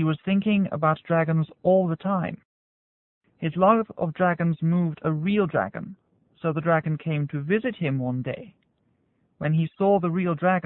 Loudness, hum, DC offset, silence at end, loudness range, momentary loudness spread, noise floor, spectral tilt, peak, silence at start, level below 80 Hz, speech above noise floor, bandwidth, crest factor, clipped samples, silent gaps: -24 LUFS; none; under 0.1%; 0.05 s; 3 LU; 10 LU; -69 dBFS; -12 dB/octave; -6 dBFS; 0 s; -62 dBFS; 45 dB; 4 kHz; 18 dB; under 0.1%; 2.45-3.21 s